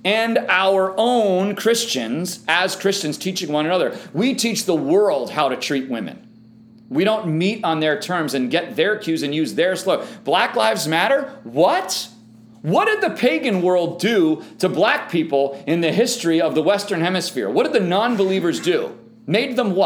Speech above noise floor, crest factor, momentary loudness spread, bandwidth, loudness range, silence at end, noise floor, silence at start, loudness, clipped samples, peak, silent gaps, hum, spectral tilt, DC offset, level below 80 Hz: 27 dB; 18 dB; 6 LU; over 20 kHz; 2 LU; 0 s; -46 dBFS; 0.05 s; -19 LUFS; under 0.1%; -2 dBFS; none; none; -4.5 dB/octave; under 0.1%; -72 dBFS